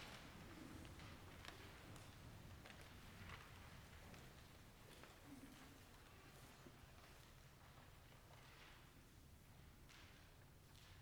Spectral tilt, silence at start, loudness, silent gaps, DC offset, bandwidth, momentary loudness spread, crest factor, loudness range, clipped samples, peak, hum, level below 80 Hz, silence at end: -4 dB/octave; 0 s; -62 LUFS; none; under 0.1%; over 20 kHz; 7 LU; 28 dB; 5 LU; under 0.1%; -34 dBFS; none; -70 dBFS; 0 s